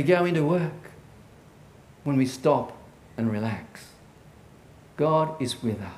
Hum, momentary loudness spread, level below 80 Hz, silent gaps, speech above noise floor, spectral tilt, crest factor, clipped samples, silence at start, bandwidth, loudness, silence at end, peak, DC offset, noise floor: none; 22 LU; -60 dBFS; none; 26 dB; -6.5 dB/octave; 20 dB; under 0.1%; 0 s; 15.5 kHz; -26 LUFS; 0 s; -8 dBFS; under 0.1%; -51 dBFS